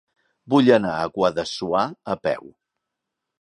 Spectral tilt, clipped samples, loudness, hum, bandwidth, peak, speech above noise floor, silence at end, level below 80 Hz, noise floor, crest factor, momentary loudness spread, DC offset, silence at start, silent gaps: -6 dB/octave; under 0.1%; -21 LUFS; none; 10.5 kHz; -2 dBFS; 62 dB; 0.95 s; -58 dBFS; -82 dBFS; 22 dB; 11 LU; under 0.1%; 0.45 s; none